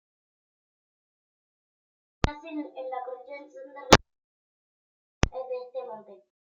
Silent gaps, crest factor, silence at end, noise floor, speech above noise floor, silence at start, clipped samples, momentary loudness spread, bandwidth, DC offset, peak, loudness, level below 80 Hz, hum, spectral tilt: 4.24-5.21 s; 32 dB; 0.35 s; under -90 dBFS; over 61 dB; 2.25 s; under 0.1%; 23 LU; 15.5 kHz; under 0.1%; 0 dBFS; -27 LUFS; -44 dBFS; none; -4 dB/octave